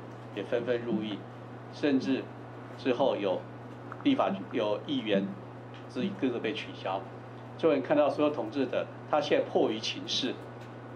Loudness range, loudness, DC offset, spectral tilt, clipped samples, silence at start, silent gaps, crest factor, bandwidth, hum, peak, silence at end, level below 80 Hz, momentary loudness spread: 3 LU; -31 LUFS; under 0.1%; -5.5 dB/octave; under 0.1%; 0 s; none; 18 dB; 9.4 kHz; none; -14 dBFS; 0 s; -72 dBFS; 17 LU